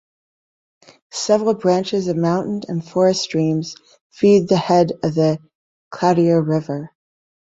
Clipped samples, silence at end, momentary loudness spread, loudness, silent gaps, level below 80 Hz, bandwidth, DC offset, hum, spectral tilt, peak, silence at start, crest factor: under 0.1%; 0.7 s; 13 LU; -18 LUFS; 4.01-4.10 s, 5.55-5.91 s; -60 dBFS; 8 kHz; under 0.1%; none; -6 dB/octave; -2 dBFS; 1.15 s; 16 dB